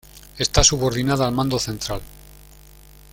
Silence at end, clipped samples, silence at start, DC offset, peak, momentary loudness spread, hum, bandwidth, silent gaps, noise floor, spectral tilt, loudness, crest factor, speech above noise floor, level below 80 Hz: 0.75 s; under 0.1%; 0.15 s; under 0.1%; -2 dBFS; 13 LU; none; 17 kHz; none; -46 dBFS; -3.5 dB/octave; -20 LUFS; 22 dB; 26 dB; -34 dBFS